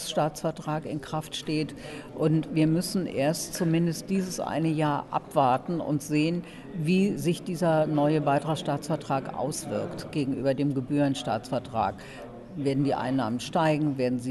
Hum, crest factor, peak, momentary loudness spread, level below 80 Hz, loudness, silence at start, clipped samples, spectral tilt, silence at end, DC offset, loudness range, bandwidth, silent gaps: none; 18 dB; -10 dBFS; 8 LU; -58 dBFS; -28 LUFS; 0 s; under 0.1%; -6 dB/octave; 0 s; under 0.1%; 2 LU; 12 kHz; none